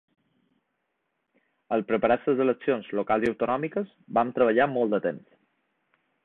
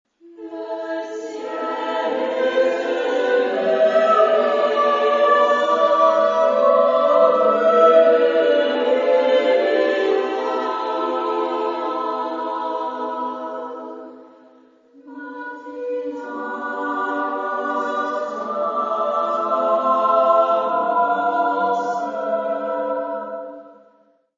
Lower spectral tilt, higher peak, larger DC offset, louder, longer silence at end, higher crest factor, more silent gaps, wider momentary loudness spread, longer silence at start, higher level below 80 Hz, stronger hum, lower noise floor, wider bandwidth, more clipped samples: first, -8 dB/octave vs -4.5 dB/octave; second, -8 dBFS vs -2 dBFS; neither; second, -26 LUFS vs -19 LUFS; first, 1.05 s vs 0.65 s; about the same, 18 dB vs 18 dB; neither; second, 8 LU vs 14 LU; first, 1.7 s vs 0.25 s; first, -66 dBFS vs -76 dBFS; neither; first, -78 dBFS vs -57 dBFS; second, 6 kHz vs 7.6 kHz; neither